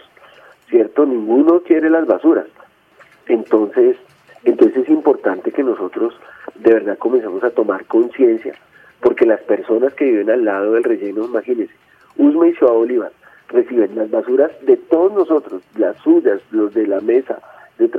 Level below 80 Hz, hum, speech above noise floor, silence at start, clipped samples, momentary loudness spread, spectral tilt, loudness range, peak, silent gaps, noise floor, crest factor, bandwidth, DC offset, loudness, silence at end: -66 dBFS; none; 34 dB; 0.7 s; under 0.1%; 8 LU; -8 dB/octave; 2 LU; 0 dBFS; none; -49 dBFS; 16 dB; 3.6 kHz; under 0.1%; -15 LUFS; 0 s